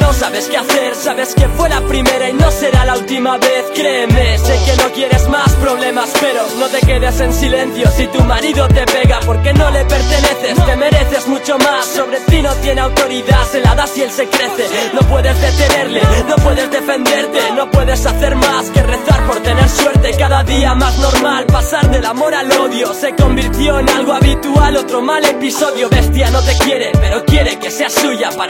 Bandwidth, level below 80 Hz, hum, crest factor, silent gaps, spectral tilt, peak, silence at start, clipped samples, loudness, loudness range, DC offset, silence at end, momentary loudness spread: 17 kHz; -16 dBFS; none; 10 dB; none; -5 dB/octave; 0 dBFS; 0 s; 0.2%; -12 LUFS; 1 LU; under 0.1%; 0 s; 3 LU